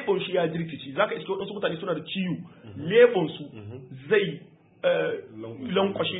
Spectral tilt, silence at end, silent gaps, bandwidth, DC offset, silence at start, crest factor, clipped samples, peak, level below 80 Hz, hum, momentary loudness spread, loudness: -10 dB/octave; 0 s; none; 4 kHz; under 0.1%; 0 s; 20 dB; under 0.1%; -6 dBFS; -68 dBFS; none; 20 LU; -26 LUFS